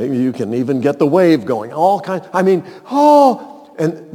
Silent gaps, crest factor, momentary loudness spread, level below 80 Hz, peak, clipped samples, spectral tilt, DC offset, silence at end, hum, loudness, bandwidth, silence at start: none; 14 dB; 10 LU; -68 dBFS; 0 dBFS; under 0.1%; -7 dB/octave; under 0.1%; 0 s; none; -14 LUFS; 18 kHz; 0 s